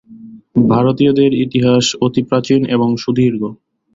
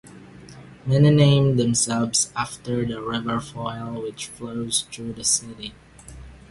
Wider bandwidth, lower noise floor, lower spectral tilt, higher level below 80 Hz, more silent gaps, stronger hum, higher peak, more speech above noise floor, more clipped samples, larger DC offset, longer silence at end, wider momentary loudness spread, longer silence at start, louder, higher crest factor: second, 7.8 kHz vs 11.5 kHz; second, -37 dBFS vs -43 dBFS; first, -6 dB/octave vs -4.5 dB/octave; about the same, -50 dBFS vs -50 dBFS; neither; neither; about the same, -2 dBFS vs -4 dBFS; about the same, 24 dB vs 22 dB; neither; neither; first, 0.4 s vs 0.15 s; second, 5 LU vs 18 LU; about the same, 0.1 s vs 0.05 s; first, -14 LUFS vs -22 LUFS; second, 12 dB vs 18 dB